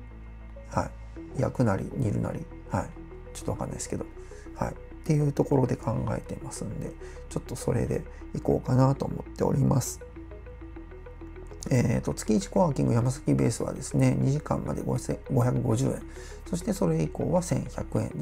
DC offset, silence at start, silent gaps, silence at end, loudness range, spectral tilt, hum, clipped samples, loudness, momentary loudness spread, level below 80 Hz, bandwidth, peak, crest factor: under 0.1%; 0 s; none; 0 s; 5 LU; -7 dB/octave; none; under 0.1%; -28 LUFS; 19 LU; -44 dBFS; 15.5 kHz; -10 dBFS; 18 dB